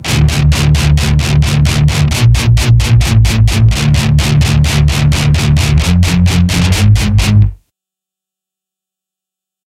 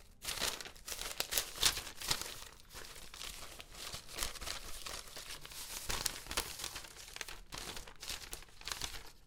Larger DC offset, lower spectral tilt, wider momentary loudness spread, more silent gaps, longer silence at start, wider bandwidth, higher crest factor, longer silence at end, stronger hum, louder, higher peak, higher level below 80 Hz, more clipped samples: neither; first, -5.5 dB/octave vs -0.5 dB/octave; second, 2 LU vs 13 LU; neither; about the same, 0 s vs 0 s; second, 15.5 kHz vs 18 kHz; second, 10 dB vs 30 dB; first, 2.15 s vs 0 s; neither; first, -10 LUFS vs -40 LUFS; first, 0 dBFS vs -12 dBFS; first, -16 dBFS vs -54 dBFS; neither